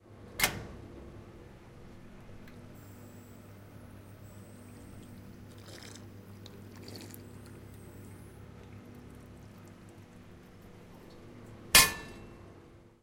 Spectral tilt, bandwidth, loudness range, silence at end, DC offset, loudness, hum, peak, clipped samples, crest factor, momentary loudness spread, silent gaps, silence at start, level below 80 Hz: -1 dB/octave; 16.5 kHz; 22 LU; 0.05 s; under 0.1%; -25 LUFS; none; -6 dBFS; under 0.1%; 34 dB; 22 LU; none; 0 s; -54 dBFS